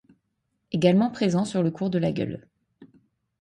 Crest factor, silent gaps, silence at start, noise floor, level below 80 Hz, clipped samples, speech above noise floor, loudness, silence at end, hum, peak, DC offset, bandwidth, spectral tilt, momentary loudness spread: 20 dB; none; 0.7 s; -76 dBFS; -62 dBFS; under 0.1%; 53 dB; -24 LUFS; 0.55 s; none; -6 dBFS; under 0.1%; 11 kHz; -7 dB/octave; 12 LU